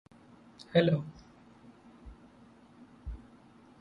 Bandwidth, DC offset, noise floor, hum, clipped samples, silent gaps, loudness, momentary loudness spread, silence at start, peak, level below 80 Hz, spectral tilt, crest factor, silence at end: 7.6 kHz; under 0.1%; -58 dBFS; none; under 0.1%; none; -29 LUFS; 28 LU; 0.6 s; -12 dBFS; -54 dBFS; -8 dB/octave; 24 dB; 0.65 s